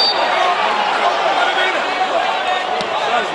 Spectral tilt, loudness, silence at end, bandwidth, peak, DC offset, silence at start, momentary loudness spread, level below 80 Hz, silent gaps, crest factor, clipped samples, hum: -1.5 dB/octave; -16 LUFS; 0 s; 11.5 kHz; -2 dBFS; under 0.1%; 0 s; 3 LU; -60 dBFS; none; 14 dB; under 0.1%; none